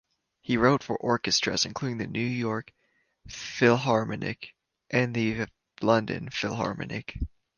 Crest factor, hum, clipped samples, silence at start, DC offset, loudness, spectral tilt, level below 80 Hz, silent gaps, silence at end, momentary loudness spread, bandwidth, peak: 22 dB; none; under 0.1%; 0.5 s; under 0.1%; -27 LUFS; -4.5 dB/octave; -48 dBFS; none; 0.3 s; 14 LU; 10 kHz; -8 dBFS